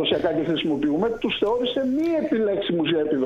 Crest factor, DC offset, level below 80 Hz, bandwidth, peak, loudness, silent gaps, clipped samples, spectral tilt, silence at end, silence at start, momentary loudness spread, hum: 14 dB; under 0.1%; -52 dBFS; 7.6 kHz; -8 dBFS; -23 LUFS; none; under 0.1%; -7 dB/octave; 0 s; 0 s; 1 LU; none